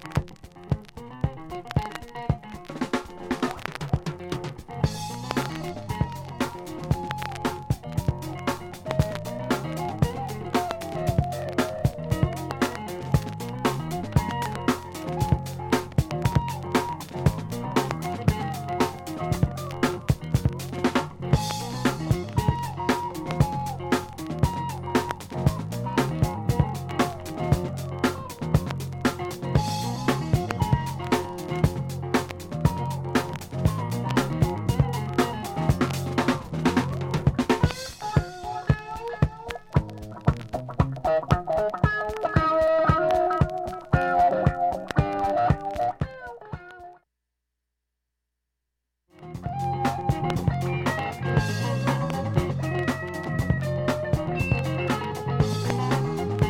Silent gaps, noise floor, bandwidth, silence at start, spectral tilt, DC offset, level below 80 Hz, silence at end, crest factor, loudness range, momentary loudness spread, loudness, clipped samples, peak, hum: none; -82 dBFS; 17 kHz; 0 s; -6.5 dB/octave; under 0.1%; -40 dBFS; 0 s; 22 dB; 7 LU; 8 LU; -27 LUFS; under 0.1%; -4 dBFS; none